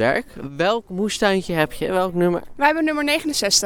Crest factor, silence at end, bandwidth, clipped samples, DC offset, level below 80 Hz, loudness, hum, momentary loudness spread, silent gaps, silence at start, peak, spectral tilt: 18 dB; 0 s; 18.5 kHz; under 0.1%; under 0.1%; -46 dBFS; -20 LUFS; none; 5 LU; none; 0 s; -2 dBFS; -3.5 dB/octave